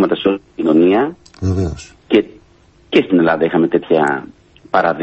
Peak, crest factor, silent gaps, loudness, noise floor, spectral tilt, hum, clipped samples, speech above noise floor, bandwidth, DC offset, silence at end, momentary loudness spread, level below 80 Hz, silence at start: 0 dBFS; 14 dB; none; -15 LUFS; -49 dBFS; -7 dB/octave; none; under 0.1%; 35 dB; 8.4 kHz; under 0.1%; 0 s; 11 LU; -38 dBFS; 0 s